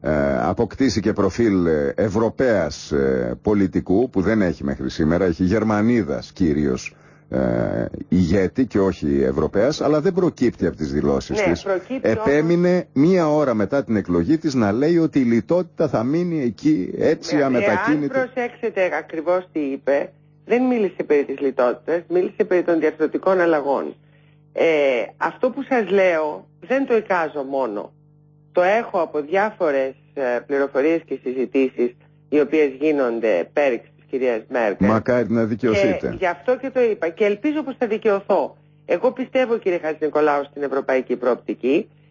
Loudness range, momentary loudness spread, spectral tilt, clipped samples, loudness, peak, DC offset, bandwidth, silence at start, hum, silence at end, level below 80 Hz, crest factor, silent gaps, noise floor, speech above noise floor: 3 LU; 6 LU; -7 dB/octave; under 0.1%; -20 LUFS; -6 dBFS; under 0.1%; 7.4 kHz; 0 s; 50 Hz at -55 dBFS; 0.25 s; -44 dBFS; 14 dB; none; -52 dBFS; 33 dB